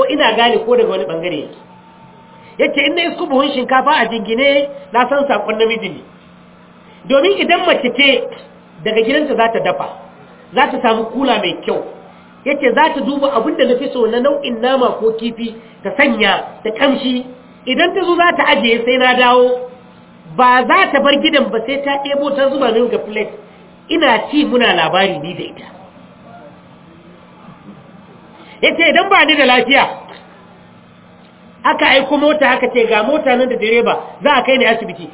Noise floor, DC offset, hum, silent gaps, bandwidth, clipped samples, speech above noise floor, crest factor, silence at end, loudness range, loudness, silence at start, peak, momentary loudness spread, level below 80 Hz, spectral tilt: -42 dBFS; under 0.1%; none; none; 4 kHz; under 0.1%; 29 dB; 14 dB; 0.05 s; 4 LU; -13 LUFS; 0 s; 0 dBFS; 12 LU; -54 dBFS; -7.5 dB/octave